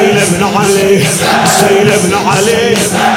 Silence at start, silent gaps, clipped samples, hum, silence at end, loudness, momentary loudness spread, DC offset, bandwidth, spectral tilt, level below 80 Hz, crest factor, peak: 0 s; none; 0.9%; none; 0 s; -8 LUFS; 2 LU; under 0.1%; 17 kHz; -3.5 dB/octave; -42 dBFS; 8 dB; 0 dBFS